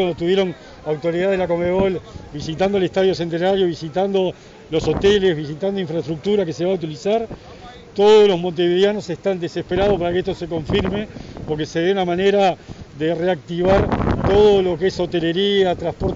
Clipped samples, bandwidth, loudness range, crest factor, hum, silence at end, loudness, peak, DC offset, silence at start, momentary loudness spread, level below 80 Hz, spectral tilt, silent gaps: under 0.1%; 7.8 kHz; 3 LU; 16 dB; none; 0 s; -19 LUFS; -4 dBFS; under 0.1%; 0 s; 12 LU; -38 dBFS; -6.5 dB/octave; none